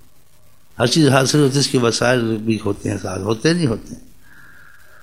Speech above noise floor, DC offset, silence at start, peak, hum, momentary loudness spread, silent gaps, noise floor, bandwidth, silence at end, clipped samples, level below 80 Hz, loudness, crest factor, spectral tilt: 37 dB; 0.8%; 0.8 s; 0 dBFS; none; 10 LU; none; -54 dBFS; 15.5 kHz; 1.05 s; under 0.1%; -48 dBFS; -17 LUFS; 18 dB; -5 dB/octave